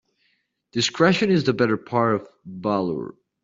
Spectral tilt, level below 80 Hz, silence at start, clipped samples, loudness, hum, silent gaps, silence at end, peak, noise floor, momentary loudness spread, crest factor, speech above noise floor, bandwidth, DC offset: -4.5 dB/octave; -62 dBFS; 0.75 s; under 0.1%; -22 LUFS; none; none; 0.3 s; -4 dBFS; -69 dBFS; 13 LU; 20 dB; 48 dB; 7.8 kHz; under 0.1%